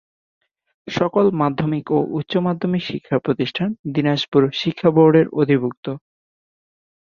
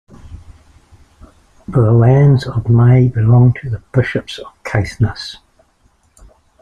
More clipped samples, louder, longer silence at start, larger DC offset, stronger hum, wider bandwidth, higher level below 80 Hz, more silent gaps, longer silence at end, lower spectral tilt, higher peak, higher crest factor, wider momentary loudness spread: neither; second, -19 LUFS vs -13 LUFS; first, 0.85 s vs 0.25 s; neither; neither; about the same, 7.2 kHz vs 7.4 kHz; second, -58 dBFS vs -38 dBFS; first, 3.79-3.84 s, 4.28-4.32 s, 5.77-5.83 s vs none; second, 1.05 s vs 1.3 s; about the same, -7.5 dB/octave vs -8.5 dB/octave; about the same, -2 dBFS vs -2 dBFS; first, 18 dB vs 12 dB; second, 10 LU vs 14 LU